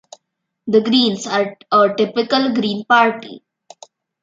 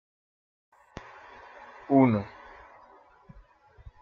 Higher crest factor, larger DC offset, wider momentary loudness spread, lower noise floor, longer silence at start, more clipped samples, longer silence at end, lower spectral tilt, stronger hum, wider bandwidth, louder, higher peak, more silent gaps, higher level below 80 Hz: second, 16 dB vs 22 dB; neither; second, 8 LU vs 27 LU; first, -75 dBFS vs -56 dBFS; second, 0.65 s vs 1.9 s; neither; second, 0.85 s vs 1.75 s; second, -4.5 dB/octave vs -10 dB/octave; neither; first, 7.8 kHz vs 6.4 kHz; first, -16 LUFS vs -24 LUFS; first, 0 dBFS vs -10 dBFS; neither; second, -66 dBFS vs -60 dBFS